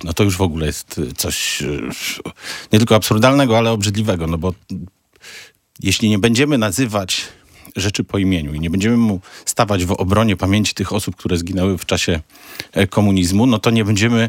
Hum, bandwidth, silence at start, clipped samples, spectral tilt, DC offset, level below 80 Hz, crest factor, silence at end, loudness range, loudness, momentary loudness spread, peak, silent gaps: none; 17 kHz; 0 s; under 0.1%; -5 dB/octave; under 0.1%; -42 dBFS; 16 dB; 0 s; 2 LU; -17 LUFS; 11 LU; 0 dBFS; none